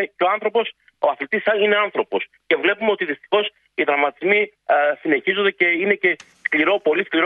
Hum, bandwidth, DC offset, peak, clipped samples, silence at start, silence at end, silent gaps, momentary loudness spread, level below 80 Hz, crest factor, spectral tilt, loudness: none; 6.8 kHz; under 0.1%; -2 dBFS; under 0.1%; 0 s; 0 s; none; 6 LU; -72 dBFS; 18 dB; -5.5 dB/octave; -19 LUFS